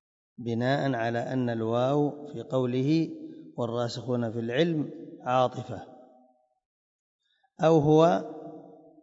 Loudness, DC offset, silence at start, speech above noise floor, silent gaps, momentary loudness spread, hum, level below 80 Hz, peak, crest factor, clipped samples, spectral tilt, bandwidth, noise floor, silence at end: -27 LUFS; under 0.1%; 0.4 s; 37 dB; 6.65-7.19 s; 18 LU; none; -68 dBFS; -8 dBFS; 20 dB; under 0.1%; -7.5 dB/octave; 7.8 kHz; -64 dBFS; 0.3 s